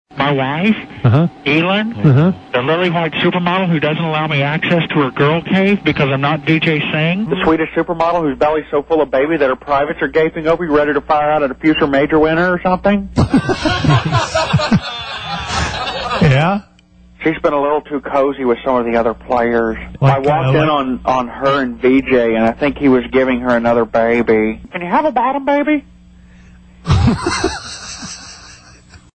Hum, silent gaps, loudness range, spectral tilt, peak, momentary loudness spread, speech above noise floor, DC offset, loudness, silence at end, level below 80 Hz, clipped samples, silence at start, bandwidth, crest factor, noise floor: none; none; 3 LU; -6.5 dB/octave; -2 dBFS; 6 LU; 31 dB; under 0.1%; -15 LUFS; 0.2 s; -36 dBFS; under 0.1%; 0.1 s; 9 kHz; 14 dB; -44 dBFS